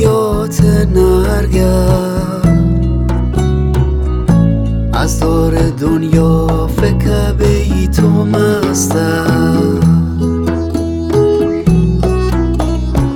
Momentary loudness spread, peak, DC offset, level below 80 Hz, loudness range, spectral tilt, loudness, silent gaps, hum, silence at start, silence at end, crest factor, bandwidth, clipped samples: 4 LU; 0 dBFS; under 0.1%; -18 dBFS; 1 LU; -7 dB/octave; -12 LUFS; none; none; 0 s; 0 s; 10 dB; 17 kHz; 0.1%